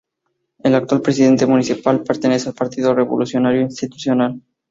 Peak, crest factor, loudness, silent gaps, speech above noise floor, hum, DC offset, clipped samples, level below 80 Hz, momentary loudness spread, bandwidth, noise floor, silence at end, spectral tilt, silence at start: -2 dBFS; 16 dB; -17 LUFS; none; 57 dB; none; under 0.1%; under 0.1%; -58 dBFS; 8 LU; 7.8 kHz; -73 dBFS; 0.3 s; -6 dB/octave; 0.65 s